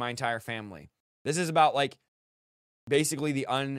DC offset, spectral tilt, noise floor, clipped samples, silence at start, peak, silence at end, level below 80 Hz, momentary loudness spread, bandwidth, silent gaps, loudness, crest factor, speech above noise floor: under 0.1%; -4 dB/octave; under -90 dBFS; under 0.1%; 0 s; -10 dBFS; 0 s; -70 dBFS; 14 LU; 16 kHz; 1.00-1.25 s, 2.08-2.87 s; -28 LUFS; 20 dB; over 62 dB